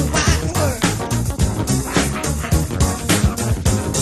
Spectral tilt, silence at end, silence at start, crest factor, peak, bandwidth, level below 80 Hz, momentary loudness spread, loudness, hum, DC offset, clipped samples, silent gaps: -4.5 dB/octave; 0 s; 0 s; 16 dB; -2 dBFS; 13 kHz; -26 dBFS; 3 LU; -19 LUFS; none; under 0.1%; under 0.1%; none